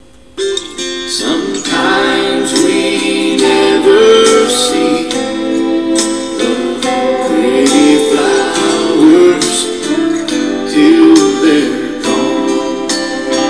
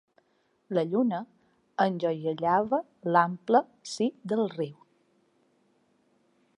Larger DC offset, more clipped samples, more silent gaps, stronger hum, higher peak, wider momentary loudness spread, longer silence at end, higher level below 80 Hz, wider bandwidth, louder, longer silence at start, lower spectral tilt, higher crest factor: first, 0.8% vs under 0.1%; first, 0.4% vs under 0.1%; neither; neither; first, 0 dBFS vs -8 dBFS; second, 9 LU vs 12 LU; second, 0 s vs 1.85 s; first, -46 dBFS vs -76 dBFS; about the same, 11 kHz vs 11 kHz; first, -11 LUFS vs -28 LUFS; second, 0.35 s vs 0.7 s; second, -3 dB/octave vs -6 dB/octave; second, 10 dB vs 22 dB